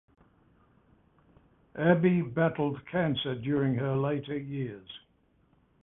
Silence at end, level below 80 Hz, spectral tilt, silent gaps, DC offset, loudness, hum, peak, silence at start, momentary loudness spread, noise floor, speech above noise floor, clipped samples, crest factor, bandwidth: 0.85 s; -62 dBFS; -11 dB/octave; none; under 0.1%; -29 LUFS; none; -8 dBFS; 1.75 s; 17 LU; -68 dBFS; 39 dB; under 0.1%; 22 dB; 3.9 kHz